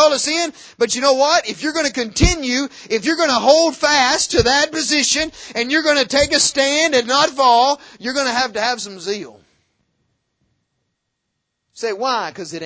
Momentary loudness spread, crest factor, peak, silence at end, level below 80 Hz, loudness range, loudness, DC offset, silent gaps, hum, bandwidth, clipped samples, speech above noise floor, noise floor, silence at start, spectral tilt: 10 LU; 18 dB; 0 dBFS; 0 s; -34 dBFS; 13 LU; -16 LUFS; under 0.1%; none; none; 8 kHz; under 0.1%; 58 dB; -75 dBFS; 0 s; -2.5 dB/octave